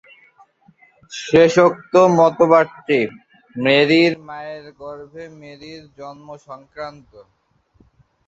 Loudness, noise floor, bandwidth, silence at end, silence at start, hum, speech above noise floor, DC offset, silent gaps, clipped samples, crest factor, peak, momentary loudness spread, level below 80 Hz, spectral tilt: -15 LUFS; -57 dBFS; 8 kHz; 1.35 s; 1.1 s; none; 39 dB; under 0.1%; none; under 0.1%; 18 dB; -2 dBFS; 25 LU; -60 dBFS; -5.5 dB/octave